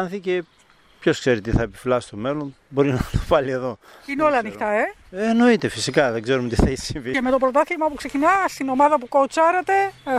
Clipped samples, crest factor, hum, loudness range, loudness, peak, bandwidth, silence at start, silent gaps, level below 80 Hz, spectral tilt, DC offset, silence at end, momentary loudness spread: under 0.1%; 18 dB; none; 3 LU; -21 LUFS; -2 dBFS; 15 kHz; 0 s; none; -36 dBFS; -5.5 dB/octave; under 0.1%; 0 s; 9 LU